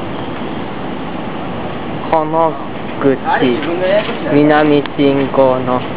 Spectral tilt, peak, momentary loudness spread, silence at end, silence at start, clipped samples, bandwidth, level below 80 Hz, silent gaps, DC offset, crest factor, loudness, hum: -10.5 dB/octave; 0 dBFS; 12 LU; 0 s; 0 s; under 0.1%; 4 kHz; -42 dBFS; none; 5%; 14 dB; -15 LUFS; none